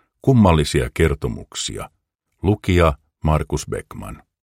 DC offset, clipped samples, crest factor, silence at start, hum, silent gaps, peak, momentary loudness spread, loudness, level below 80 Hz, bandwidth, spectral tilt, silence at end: under 0.1%; under 0.1%; 18 dB; 0.25 s; none; 2.15-2.19 s; -2 dBFS; 19 LU; -19 LUFS; -30 dBFS; 16 kHz; -6 dB/octave; 0.35 s